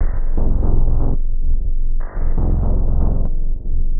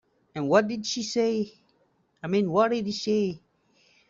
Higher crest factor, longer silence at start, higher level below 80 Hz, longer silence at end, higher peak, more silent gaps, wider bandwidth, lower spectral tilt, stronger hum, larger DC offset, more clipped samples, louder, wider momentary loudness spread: second, 10 dB vs 20 dB; second, 0 s vs 0.35 s; first, -14 dBFS vs -68 dBFS; second, 0 s vs 0.7 s; first, -2 dBFS vs -8 dBFS; neither; second, 1.9 kHz vs 7.8 kHz; first, -13.5 dB/octave vs -5 dB/octave; neither; neither; neither; first, -23 LUFS vs -26 LUFS; second, 6 LU vs 14 LU